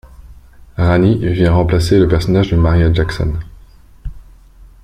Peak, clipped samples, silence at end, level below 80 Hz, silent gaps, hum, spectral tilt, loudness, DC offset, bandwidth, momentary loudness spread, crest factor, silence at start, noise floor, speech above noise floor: -2 dBFS; under 0.1%; 0.15 s; -26 dBFS; none; none; -7.5 dB/octave; -13 LUFS; under 0.1%; 11 kHz; 21 LU; 14 dB; 0.2 s; -41 dBFS; 29 dB